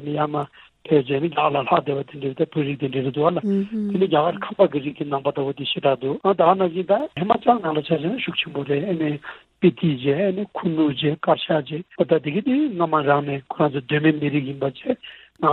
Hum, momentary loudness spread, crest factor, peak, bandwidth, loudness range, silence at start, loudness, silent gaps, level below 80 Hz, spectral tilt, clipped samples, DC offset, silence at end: none; 8 LU; 18 dB; -2 dBFS; 4.3 kHz; 2 LU; 0 s; -22 LUFS; none; -62 dBFS; -9.5 dB/octave; under 0.1%; under 0.1%; 0 s